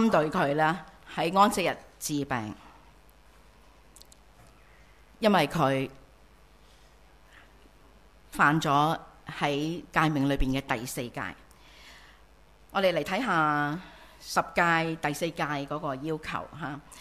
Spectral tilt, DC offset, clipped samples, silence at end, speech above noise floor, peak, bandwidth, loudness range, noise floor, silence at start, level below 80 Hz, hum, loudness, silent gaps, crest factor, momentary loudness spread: -5 dB/octave; under 0.1%; under 0.1%; 0 s; 30 dB; -8 dBFS; 15.5 kHz; 4 LU; -57 dBFS; 0 s; -50 dBFS; 60 Hz at -65 dBFS; -28 LUFS; none; 22 dB; 14 LU